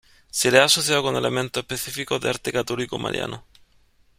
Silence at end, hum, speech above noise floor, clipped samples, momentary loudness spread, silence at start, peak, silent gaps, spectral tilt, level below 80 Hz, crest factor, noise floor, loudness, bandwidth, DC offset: 0.8 s; none; 36 dB; under 0.1%; 13 LU; 0.35 s; -2 dBFS; none; -2.5 dB/octave; -56 dBFS; 22 dB; -59 dBFS; -22 LUFS; 16 kHz; under 0.1%